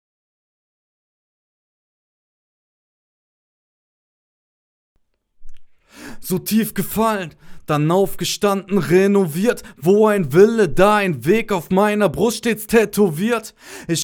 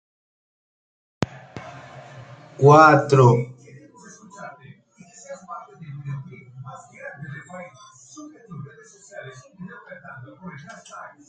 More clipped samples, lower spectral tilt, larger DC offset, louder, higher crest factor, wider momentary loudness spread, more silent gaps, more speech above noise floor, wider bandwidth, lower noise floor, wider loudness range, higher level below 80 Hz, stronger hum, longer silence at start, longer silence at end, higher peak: neither; second, -5.5 dB/octave vs -7 dB/octave; neither; about the same, -17 LUFS vs -16 LUFS; about the same, 20 dB vs 24 dB; second, 10 LU vs 28 LU; neither; second, 24 dB vs 34 dB; first, over 20 kHz vs 8.8 kHz; second, -41 dBFS vs -50 dBFS; second, 9 LU vs 22 LU; first, -44 dBFS vs -64 dBFS; neither; first, 5.4 s vs 1.2 s; second, 0 s vs 0.3 s; about the same, 0 dBFS vs 0 dBFS